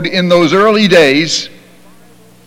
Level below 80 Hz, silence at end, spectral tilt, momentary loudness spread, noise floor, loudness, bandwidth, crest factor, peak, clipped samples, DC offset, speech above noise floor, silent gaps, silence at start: -50 dBFS; 1 s; -4.5 dB/octave; 9 LU; -43 dBFS; -9 LUFS; 16.5 kHz; 12 dB; 0 dBFS; under 0.1%; under 0.1%; 33 dB; none; 0 s